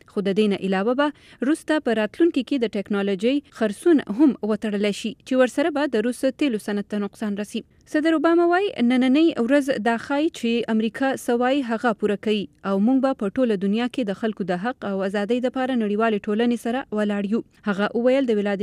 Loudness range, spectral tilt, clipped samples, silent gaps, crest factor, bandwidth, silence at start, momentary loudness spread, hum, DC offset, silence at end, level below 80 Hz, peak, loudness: 3 LU; -6 dB/octave; under 0.1%; none; 16 dB; 14 kHz; 0.15 s; 7 LU; none; under 0.1%; 0 s; -62 dBFS; -6 dBFS; -22 LUFS